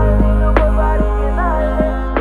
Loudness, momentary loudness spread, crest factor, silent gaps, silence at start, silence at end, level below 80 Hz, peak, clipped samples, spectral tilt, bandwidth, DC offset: -16 LUFS; 3 LU; 12 dB; none; 0 s; 0 s; -14 dBFS; 0 dBFS; under 0.1%; -9 dB/octave; 3.9 kHz; under 0.1%